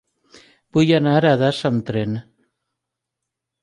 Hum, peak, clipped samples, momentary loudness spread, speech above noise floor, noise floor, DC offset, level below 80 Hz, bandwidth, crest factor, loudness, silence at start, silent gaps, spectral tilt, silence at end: none; -4 dBFS; under 0.1%; 10 LU; 65 dB; -82 dBFS; under 0.1%; -58 dBFS; 11 kHz; 16 dB; -18 LUFS; 0.75 s; none; -7 dB/octave; 1.4 s